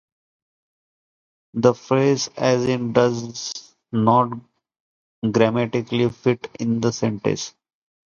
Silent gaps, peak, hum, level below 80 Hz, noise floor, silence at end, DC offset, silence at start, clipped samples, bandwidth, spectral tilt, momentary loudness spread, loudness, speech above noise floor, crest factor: 4.80-5.22 s; 0 dBFS; none; -60 dBFS; under -90 dBFS; 0.6 s; under 0.1%; 1.55 s; under 0.1%; 7.4 kHz; -5.5 dB/octave; 11 LU; -21 LUFS; over 70 dB; 22 dB